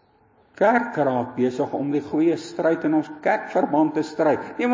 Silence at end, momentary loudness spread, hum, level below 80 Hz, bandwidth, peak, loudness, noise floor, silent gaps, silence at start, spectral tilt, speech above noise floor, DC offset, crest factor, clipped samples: 0 s; 4 LU; none; -66 dBFS; 7.6 kHz; -4 dBFS; -22 LUFS; -58 dBFS; none; 0.6 s; -7 dB/octave; 37 dB; under 0.1%; 18 dB; under 0.1%